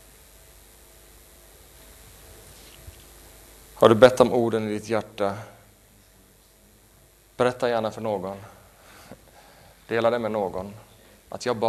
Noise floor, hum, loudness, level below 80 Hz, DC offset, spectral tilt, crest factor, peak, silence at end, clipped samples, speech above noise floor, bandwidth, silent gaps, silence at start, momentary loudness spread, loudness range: -56 dBFS; none; -23 LUFS; -56 dBFS; under 0.1%; -5.5 dB/octave; 26 dB; 0 dBFS; 0 s; under 0.1%; 34 dB; 13.5 kHz; none; 2.85 s; 30 LU; 8 LU